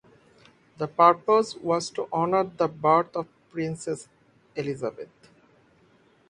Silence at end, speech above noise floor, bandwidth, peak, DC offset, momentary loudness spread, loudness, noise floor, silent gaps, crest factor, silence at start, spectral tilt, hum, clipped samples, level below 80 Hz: 1.25 s; 36 dB; 11 kHz; -4 dBFS; under 0.1%; 16 LU; -25 LUFS; -60 dBFS; none; 24 dB; 0.8 s; -5.5 dB/octave; none; under 0.1%; -68 dBFS